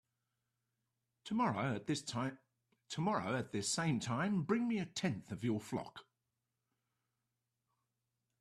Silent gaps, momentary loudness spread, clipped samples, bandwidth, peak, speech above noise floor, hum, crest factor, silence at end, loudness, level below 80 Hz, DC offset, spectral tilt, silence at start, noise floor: none; 9 LU; under 0.1%; 13.5 kHz; -22 dBFS; 51 dB; none; 18 dB; 2.4 s; -38 LUFS; -76 dBFS; under 0.1%; -5 dB/octave; 1.25 s; -88 dBFS